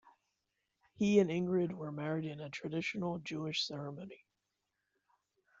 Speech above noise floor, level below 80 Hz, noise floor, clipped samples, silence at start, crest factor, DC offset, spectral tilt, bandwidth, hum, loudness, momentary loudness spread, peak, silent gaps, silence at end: 51 dB; -76 dBFS; -86 dBFS; under 0.1%; 0.05 s; 22 dB; under 0.1%; -6 dB/octave; 7.8 kHz; none; -36 LUFS; 14 LU; -16 dBFS; none; 1.45 s